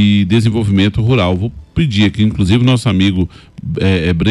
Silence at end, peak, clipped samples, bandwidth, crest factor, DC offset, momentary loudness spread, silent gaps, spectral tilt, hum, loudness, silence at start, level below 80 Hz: 0 s; -2 dBFS; under 0.1%; 11.5 kHz; 10 dB; under 0.1%; 8 LU; none; -7 dB/octave; none; -13 LUFS; 0 s; -32 dBFS